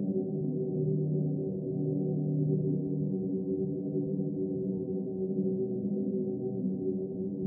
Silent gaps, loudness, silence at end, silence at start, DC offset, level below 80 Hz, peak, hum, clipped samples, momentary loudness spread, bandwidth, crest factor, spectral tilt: none; -32 LUFS; 0 s; 0 s; under 0.1%; -70 dBFS; -18 dBFS; none; under 0.1%; 4 LU; 1.1 kHz; 14 dB; -19.5 dB/octave